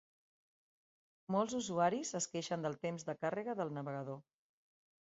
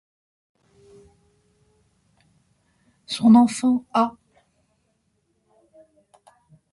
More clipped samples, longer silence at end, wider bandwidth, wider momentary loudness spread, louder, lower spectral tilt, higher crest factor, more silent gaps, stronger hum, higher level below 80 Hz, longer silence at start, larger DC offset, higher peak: neither; second, 0.85 s vs 2.65 s; second, 7.6 kHz vs 11.5 kHz; about the same, 9 LU vs 11 LU; second, -39 LUFS vs -19 LUFS; about the same, -5 dB/octave vs -5.5 dB/octave; about the same, 22 dB vs 20 dB; neither; neither; second, -82 dBFS vs -66 dBFS; second, 1.3 s vs 3.1 s; neither; second, -20 dBFS vs -6 dBFS